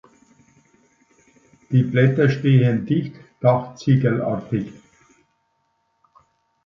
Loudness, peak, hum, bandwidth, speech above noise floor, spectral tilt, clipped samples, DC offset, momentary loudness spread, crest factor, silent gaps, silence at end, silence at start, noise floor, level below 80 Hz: -19 LUFS; -2 dBFS; none; 7 kHz; 51 dB; -9 dB/octave; under 0.1%; under 0.1%; 10 LU; 18 dB; none; 1.95 s; 1.7 s; -69 dBFS; -58 dBFS